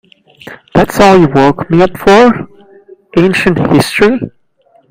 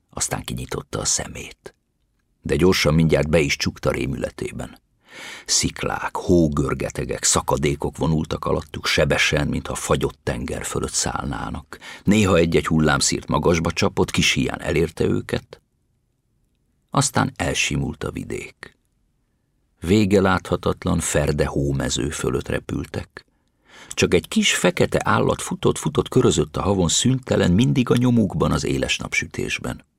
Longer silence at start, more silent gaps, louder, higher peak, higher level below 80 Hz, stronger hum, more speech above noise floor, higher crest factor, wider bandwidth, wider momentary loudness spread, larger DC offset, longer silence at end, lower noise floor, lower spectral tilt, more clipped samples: first, 0.45 s vs 0.15 s; neither; first, -9 LUFS vs -21 LUFS; first, 0 dBFS vs -4 dBFS; about the same, -36 dBFS vs -38 dBFS; neither; second, 42 dB vs 48 dB; second, 10 dB vs 18 dB; about the same, 16.5 kHz vs 16 kHz; about the same, 11 LU vs 12 LU; neither; first, 0.65 s vs 0.2 s; second, -50 dBFS vs -68 dBFS; first, -6 dB/octave vs -4.5 dB/octave; first, 1% vs under 0.1%